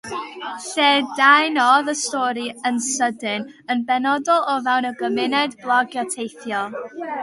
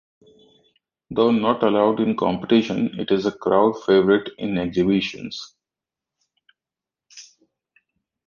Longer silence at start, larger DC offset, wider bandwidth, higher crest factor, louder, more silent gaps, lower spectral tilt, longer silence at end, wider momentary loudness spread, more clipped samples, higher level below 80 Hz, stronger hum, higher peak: second, 0.05 s vs 1.1 s; neither; first, 11.5 kHz vs 7.2 kHz; about the same, 20 dB vs 20 dB; about the same, -19 LUFS vs -20 LUFS; neither; second, -1.5 dB/octave vs -6.5 dB/octave; second, 0 s vs 1.05 s; about the same, 13 LU vs 11 LU; neither; second, -70 dBFS vs -56 dBFS; neither; first, 0 dBFS vs -4 dBFS